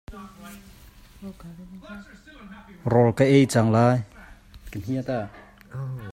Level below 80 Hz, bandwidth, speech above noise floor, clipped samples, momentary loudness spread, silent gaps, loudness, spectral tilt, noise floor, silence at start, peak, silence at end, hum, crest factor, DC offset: -50 dBFS; 15.5 kHz; 23 dB; under 0.1%; 25 LU; none; -22 LUFS; -7 dB/octave; -46 dBFS; 0.1 s; -4 dBFS; 0 s; none; 20 dB; under 0.1%